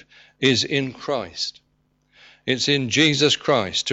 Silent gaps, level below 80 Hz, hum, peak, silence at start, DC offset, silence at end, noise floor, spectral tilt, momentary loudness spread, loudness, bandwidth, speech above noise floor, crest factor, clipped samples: none; -60 dBFS; none; -6 dBFS; 0.4 s; under 0.1%; 0 s; -66 dBFS; -3.5 dB/octave; 11 LU; -20 LUFS; 8.2 kHz; 45 dB; 18 dB; under 0.1%